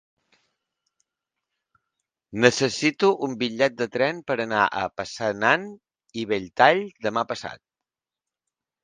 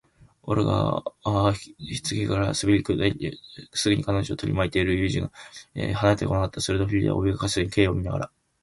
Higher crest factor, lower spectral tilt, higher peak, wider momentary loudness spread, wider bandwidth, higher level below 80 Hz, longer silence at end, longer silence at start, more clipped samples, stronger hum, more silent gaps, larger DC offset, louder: about the same, 24 dB vs 20 dB; second, -4 dB/octave vs -5.5 dB/octave; first, 0 dBFS vs -4 dBFS; about the same, 13 LU vs 11 LU; second, 9.8 kHz vs 11.5 kHz; second, -64 dBFS vs -42 dBFS; first, 1.3 s vs 0.35 s; first, 2.3 s vs 0.45 s; neither; neither; neither; neither; about the same, -23 LUFS vs -25 LUFS